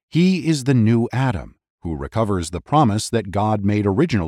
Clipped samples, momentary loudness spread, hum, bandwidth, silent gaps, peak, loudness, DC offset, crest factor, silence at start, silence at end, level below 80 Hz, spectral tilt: under 0.1%; 10 LU; none; 13.5 kHz; 1.70-1.78 s; -4 dBFS; -19 LUFS; under 0.1%; 14 dB; 0.15 s; 0 s; -42 dBFS; -6.5 dB/octave